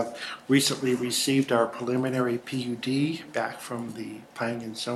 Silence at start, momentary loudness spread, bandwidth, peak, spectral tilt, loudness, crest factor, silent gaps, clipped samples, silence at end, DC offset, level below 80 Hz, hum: 0 s; 12 LU; 13.5 kHz; -8 dBFS; -4 dB/octave; -27 LUFS; 18 dB; none; under 0.1%; 0 s; under 0.1%; -70 dBFS; none